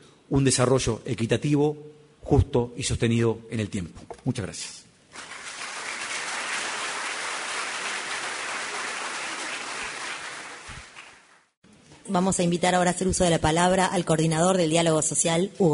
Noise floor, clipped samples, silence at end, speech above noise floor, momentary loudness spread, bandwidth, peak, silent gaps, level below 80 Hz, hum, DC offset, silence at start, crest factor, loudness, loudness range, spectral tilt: -54 dBFS; under 0.1%; 0 s; 31 dB; 16 LU; 11 kHz; -6 dBFS; 11.57-11.62 s; -46 dBFS; none; under 0.1%; 0.3 s; 18 dB; -25 LUFS; 10 LU; -4.5 dB/octave